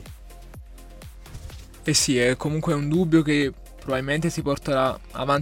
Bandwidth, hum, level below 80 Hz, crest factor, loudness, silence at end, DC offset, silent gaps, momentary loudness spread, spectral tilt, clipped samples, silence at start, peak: 16.5 kHz; none; -42 dBFS; 18 dB; -23 LUFS; 0 s; under 0.1%; none; 23 LU; -4.5 dB/octave; under 0.1%; 0 s; -6 dBFS